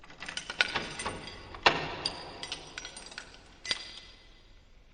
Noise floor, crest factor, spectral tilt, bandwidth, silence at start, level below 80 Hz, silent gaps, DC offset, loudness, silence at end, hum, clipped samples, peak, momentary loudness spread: -56 dBFS; 30 dB; -2 dB/octave; 9.8 kHz; 0 s; -56 dBFS; none; under 0.1%; -33 LUFS; 0 s; none; under 0.1%; -6 dBFS; 18 LU